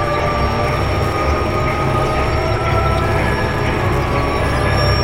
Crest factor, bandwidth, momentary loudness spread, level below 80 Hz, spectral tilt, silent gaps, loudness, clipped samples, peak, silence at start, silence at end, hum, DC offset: 14 dB; 16.5 kHz; 2 LU; -24 dBFS; -6.5 dB/octave; none; -17 LUFS; under 0.1%; -2 dBFS; 0 s; 0 s; none; 1%